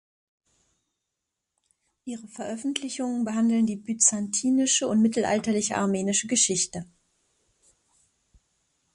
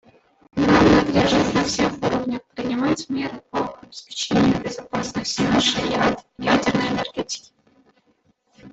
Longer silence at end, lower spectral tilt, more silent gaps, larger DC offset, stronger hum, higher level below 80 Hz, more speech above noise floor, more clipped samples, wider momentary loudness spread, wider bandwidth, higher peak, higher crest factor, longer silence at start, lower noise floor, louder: first, 2.1 s vs 0.05 s; second, -3 dB/octave vs -4.5 dB/octave; neither; neither; neither; second, -66 dBFS vs -44 dBFS; first, 59 dB vs 43 dB; neither; first, 15 LU vs 12 LU; first, 11.5 kHz vs 8.4 kHz; about the same, -6 dBFS vs -4 dBFS; about the same, 22 dB vs 18 dB; first, 2.05 s vs 0.55 s; first, -84 dBFS vs -63 dBFS; second, -24 LUFS vs -21 LUFS